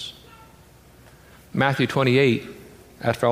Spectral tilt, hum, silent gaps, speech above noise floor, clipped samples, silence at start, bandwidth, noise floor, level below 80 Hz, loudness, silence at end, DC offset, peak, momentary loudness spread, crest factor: -6.5 dB/octave; none; none; 30 dB; under 0.1%; 0 s; 15.5 kHz; -50 dBFS; -56 dBFS; -21 LUFS; 0 s; under 0.1%; -4 dBFS; 20 LU; 20 dB